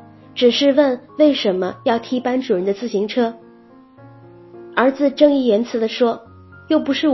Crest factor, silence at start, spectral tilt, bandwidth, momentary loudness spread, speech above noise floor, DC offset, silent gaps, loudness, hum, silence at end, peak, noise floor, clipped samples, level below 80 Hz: 18 dB; 0.35 s; -5.5 dB/octave; 6 kHz; 7 LU; 29 dB; under 0.1%; none; -18 LUFS; none; 0 s; 0 dBFS; -46 dBFS; under 0.1%; -60 dBFS